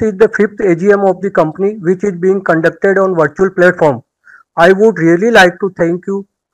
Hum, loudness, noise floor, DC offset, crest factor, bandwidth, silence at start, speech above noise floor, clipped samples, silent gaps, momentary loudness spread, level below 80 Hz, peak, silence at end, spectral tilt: none; -11 LUFS; -44 dBFS; under 0.1%; 10 dB; 13 kHz; 0 s; 33 dB; 0.7%; none; 8 LU; -48 dBFS; 0 dBFS; 0.3 s; -6 dB/octave